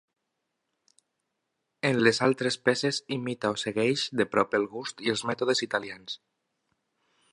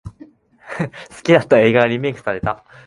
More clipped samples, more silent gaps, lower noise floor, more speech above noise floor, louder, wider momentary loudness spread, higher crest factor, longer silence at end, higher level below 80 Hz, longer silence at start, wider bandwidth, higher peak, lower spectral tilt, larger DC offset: neither; neither; first, -82 dBFS vs -45 dBFS; first, 54 dB vs 28 dB; second, -27 LUFS vs -17 LUFS; second, 10 LU vs 14 LU; first, 24 dB vs 18 dB; first, 1.15 s vs 0.3 s; second, -70 dBFS vs -48 dBFS; first, 1.85 s vs 0.05 s; about the same, 11.5 kHz vs 11.5 kHz; second, -6 dBFS vs 0 dBFS; second, -4 dB/octave vs -6.5 dB/octave; neither